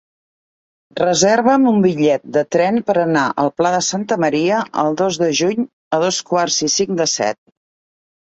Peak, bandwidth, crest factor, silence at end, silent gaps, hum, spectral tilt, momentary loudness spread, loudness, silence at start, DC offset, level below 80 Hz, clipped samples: 0 dBFS; 8.2 kHz; 16 dB; 0.95 s; 5.73-5.91 s; none; -4 dB/octave; 6 LU; -16 LUFS; 0.95 s; under 0.1%; -60 dBFS; under 0.1%